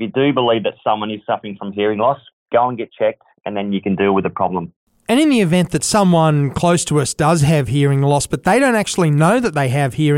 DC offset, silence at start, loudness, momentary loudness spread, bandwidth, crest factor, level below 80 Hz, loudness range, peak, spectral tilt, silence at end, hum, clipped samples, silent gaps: under 0.1%; 0 s; -16 LUFS; 9 LU; 16 kHz; 12 dB; -46 dBFS; 5 LU; -4 dBFS; -5.5 dB/octave; 0 s; none; under 0.1%; 2.33-2.46 s, 4.76-4.87 s